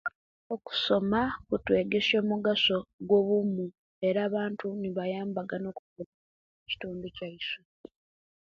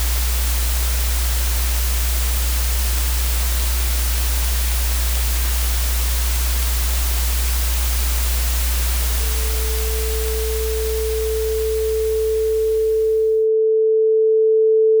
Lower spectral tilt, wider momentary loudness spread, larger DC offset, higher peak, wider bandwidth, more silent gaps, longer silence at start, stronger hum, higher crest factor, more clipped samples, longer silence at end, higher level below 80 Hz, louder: first, -6.5 dB/octave vs -3.5 dB/octave; first, 15 LU vs 5 LU; neither; second, -12 dBFS vs -2 dBFS; second, 7.2 kHz vs over 20 kHz; first, 0.15-0.50 s, 2.93-2.99 s, 3.78-4.01 s, 5.79-5.96 s, 6.06-6.66 s vs none; about the same, 0.05 s vs 0 s; neither; about the same, 18 dB vs 16 dB; neither; first, 0.9 s vs 0 s; second, -62 dBFS vs -22 dBFS; second, -29 LUFS vs -19 LUFS